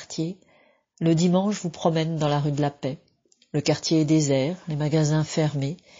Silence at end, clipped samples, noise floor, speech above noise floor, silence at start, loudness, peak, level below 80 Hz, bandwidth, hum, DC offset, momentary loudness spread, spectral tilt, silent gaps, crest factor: 0.25 s; under 0.1%; -60 dBFS; 37 dB; 0 s; -24 LUFS; -8 dBFS; -58 dBFS; 7.6 kHz; none; under 0.1%; 10 LU; -6.5 dB/octave; none; 16 dB